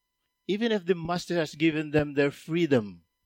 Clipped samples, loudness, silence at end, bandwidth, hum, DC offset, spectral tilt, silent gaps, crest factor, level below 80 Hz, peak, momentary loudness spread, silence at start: under 0.1%; -27 LUFS; 0.3 s; 16 kHz; none; under 0.1%; -6 dB/octave; none; 18 dB; -58 dBFS; -10 dBFS; 6 LU; 0.5 s